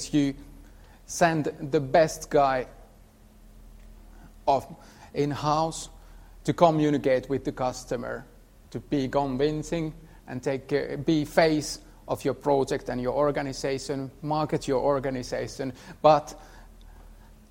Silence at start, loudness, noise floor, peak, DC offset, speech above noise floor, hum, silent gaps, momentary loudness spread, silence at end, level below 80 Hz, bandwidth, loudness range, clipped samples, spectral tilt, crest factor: 0 s; -27 LUFS; -53 dBFS; -4 dBFS; under 0.1%; 27 dB; none; none; 14 LU; 0.35 s; -50 dBFS; 16 kHz; 4 LU; under 0.1%; -5.5 dB/octave; 22 dB